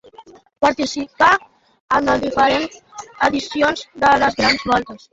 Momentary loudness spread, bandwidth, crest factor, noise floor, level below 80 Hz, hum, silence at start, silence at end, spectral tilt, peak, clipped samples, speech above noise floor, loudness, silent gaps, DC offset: 8 LU; 8 kHz; 18 dB; -44 dBFS; -48 dBFS; none; 0.2 s; 0.15 s; -3.5 dB/octave; 0 dBFS; under 0.1%; 27 dB; -17 LUFS; 1.80-1.88 s; under 0.1%